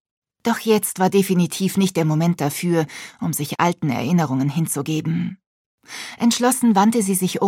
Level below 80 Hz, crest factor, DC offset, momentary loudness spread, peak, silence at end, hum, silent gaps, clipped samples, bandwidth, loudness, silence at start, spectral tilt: -66 dBFS; 18 dB; under 0.1%; 9 LU; -2 dBFS; 0 s; none; 5.46-5.78 s; under 0.1%; 17.5 kHz; -20 LUFS; 0.45 s; -5.5 dB/octave